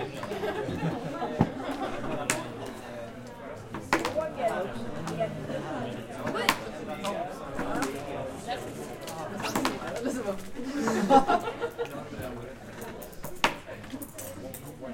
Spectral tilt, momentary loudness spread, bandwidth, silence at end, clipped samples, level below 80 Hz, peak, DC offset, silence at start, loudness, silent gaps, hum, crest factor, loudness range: -4.5 dB/octave; 13 LU; 17 kHz; 0 s; under 0.1%; -52 dBFS; -2 dBFS; under 0.1%; 0 s; -32 LUFS; none; none; 30 dB; 5 LU